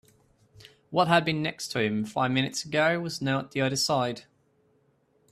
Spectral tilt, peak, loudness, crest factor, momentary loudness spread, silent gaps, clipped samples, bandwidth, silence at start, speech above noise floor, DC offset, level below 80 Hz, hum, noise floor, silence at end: -4.5 dB/octave; -6 dBFS; -27 LUFS; 22 dB; 7 LU; none; under 0.1%; 14.5 kHz; 0.6 s; 41 dB; under 0.1%; -66 dBFS; none; -67 dBFS; 1.1 s